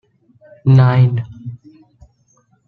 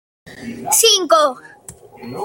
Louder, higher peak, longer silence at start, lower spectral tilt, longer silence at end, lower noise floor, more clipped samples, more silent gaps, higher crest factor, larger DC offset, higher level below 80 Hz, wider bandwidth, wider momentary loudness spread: about the same, -13 LUFS vs -13 LUFS; about the same, -2 dBFS vs 0 dBFS; first, 0.65 s vs 0.25 s; first, -9.5 dB/octave vs -0.5 dB/octave; first, 1.15 s vs 0 s; first, -58 dBFS vs -40 dBFS; neither; neither; about the same, 16 dB vs 18 dB; neither; first, -50 dBFS vs -60 dBFS; second, 4.7 kHz vs 17 kHz; about the same, 22 LU vs 23 LU